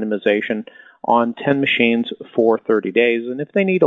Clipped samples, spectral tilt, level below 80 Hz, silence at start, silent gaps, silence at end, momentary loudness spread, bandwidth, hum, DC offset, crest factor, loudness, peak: under 0.1%; -8 dB/octave; -70 dBFS; 0 s; none; 0 s; 8 LU; 4.1 kHz; none; under 0.1%; 16 dB; -18 LUFS; -2 dBFS